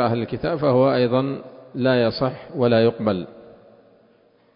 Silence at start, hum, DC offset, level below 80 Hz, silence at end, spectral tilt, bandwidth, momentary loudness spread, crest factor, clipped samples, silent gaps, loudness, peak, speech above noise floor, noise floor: 0 s; none; under 0.1%; -54 dBFS; 1.15 s; -11.5 dB/octave; 5.4 kHz; 11 LU; 16 dB; under 0.1%; none; -21 LUFS; -6 dBFS; 37 dB; -57 dBFS